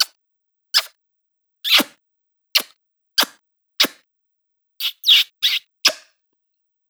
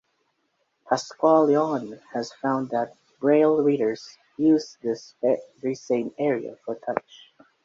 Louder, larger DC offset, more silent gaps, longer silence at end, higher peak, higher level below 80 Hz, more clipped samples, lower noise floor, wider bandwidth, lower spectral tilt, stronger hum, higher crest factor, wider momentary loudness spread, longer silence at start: first, -17 LUFS vs -24 LUFS; neither; neither; first, 0.95 s vs 0.65 s; about the same, -2 dBFS vs -4 dBFS; second, -86 dBFS vs -72 dBFS; neither; about the same, -74 dBFS vs -73 dBFS; first, over 20 kHz vs 7.8 kHz; second, 1.5 dB/octave vs -6 dB/octave; neither; about the same, 22 dB vs 20 dB; about the same, 15 LU vs 13 LU; second, 0 s vs 0.85 s